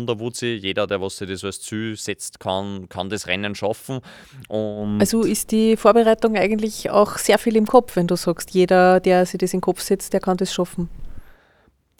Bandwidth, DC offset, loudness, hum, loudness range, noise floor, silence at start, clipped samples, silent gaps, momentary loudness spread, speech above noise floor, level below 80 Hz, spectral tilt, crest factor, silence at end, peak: 19.5 kHz; under 0.1%; -20 LUFS; none; 9 LU; -59 dBFS; 0 s; under 0.1%; none; 14 LU; 40 dB; -46 dBFS; -5 dB/octave; 20 dB; 0.75 s; 0 dBFS